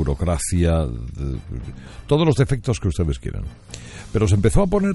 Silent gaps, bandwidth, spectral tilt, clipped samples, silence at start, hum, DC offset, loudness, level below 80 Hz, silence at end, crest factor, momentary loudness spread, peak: none; 11.5 kHz; -6.5 dB/octave; under 0.1%; 0 s; none; under 0.1%; -21 LUFS; -30 dBFS; 0 s; 16 dB; 18 LU; -4 dBFS